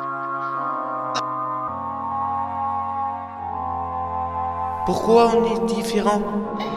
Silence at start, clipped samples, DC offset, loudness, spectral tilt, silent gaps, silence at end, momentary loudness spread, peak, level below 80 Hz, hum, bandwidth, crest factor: 0 s; under 0.1%; under 0.1%; -23 LUFS; -5.5 dB/octave; none; 0 s; 10 LU; -4 dBFS; -48 dBFS; none; 14 kHz; 18 dB